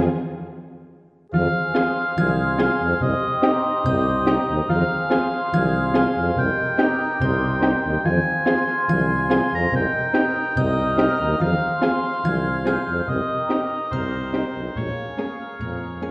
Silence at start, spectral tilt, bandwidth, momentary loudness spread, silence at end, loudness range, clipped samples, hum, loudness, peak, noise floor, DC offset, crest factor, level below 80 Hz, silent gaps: 0 s; -9 dB/octave; 7.6 kHz; 8 LU; 0 s; 3 LU; under 0.1%; none; -21 LUFS; -4 dBFS; -48 dBFS; under 0.1%; 18 dB; -42 dBFS; none